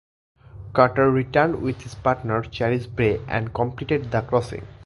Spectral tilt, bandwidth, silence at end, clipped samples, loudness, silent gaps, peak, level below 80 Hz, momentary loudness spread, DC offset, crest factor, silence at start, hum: -7.5 dB/octave; 11.5 kHz; 0 s; under 0.1%; -22 LUFS; none; 0 dBFS; -46 dBFS; 8 LU; under 0.1%; 22 dB; 0.55 s; none